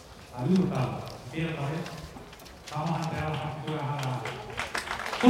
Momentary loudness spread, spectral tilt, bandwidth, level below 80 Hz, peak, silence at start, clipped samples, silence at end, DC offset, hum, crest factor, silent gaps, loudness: 16 LU; -6 dB/octave; 16 kHz; -54 dBFS; -6 dBFS; 0 s; under 0.1%; 0 s; under 0.1%; none; 24 dB; none; -32 LUFS